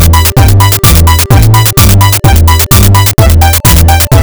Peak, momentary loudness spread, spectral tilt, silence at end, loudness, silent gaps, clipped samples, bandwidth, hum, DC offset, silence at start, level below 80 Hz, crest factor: 0 dBFS; 1 LU; -4.5 dB/octave; 0 s; -4 LUFS; none; 30%; over 20 kHz; none; 2%; 0 s; -10 dBFS; 4 dB